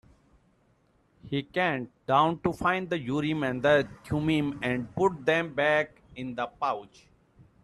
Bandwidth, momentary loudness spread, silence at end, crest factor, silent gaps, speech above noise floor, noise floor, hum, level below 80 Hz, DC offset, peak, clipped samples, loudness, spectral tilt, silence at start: 12.5 kHz; 10 LU; 0.8 s; 20 dB; none; 39 dB; -66 dBFS; none; -58 dBFS; under 0.1%; -10 dBFS; under 0.1%; -28 LUFS; -6.5 dB/octave; 1.25 s